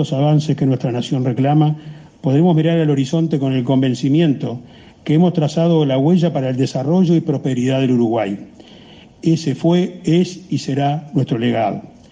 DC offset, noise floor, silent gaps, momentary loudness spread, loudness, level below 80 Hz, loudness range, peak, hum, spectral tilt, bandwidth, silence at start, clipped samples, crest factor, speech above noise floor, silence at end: under 0.1%; -42 dBFS; none; 8 LU; -17 LUFS; -56 dBFS; 2 LU; -4 dBFS; none; -7.5 dB/octave; 9 kHz; 0 s; under 0.1%; 12 dB; 26 dB; 0.2 s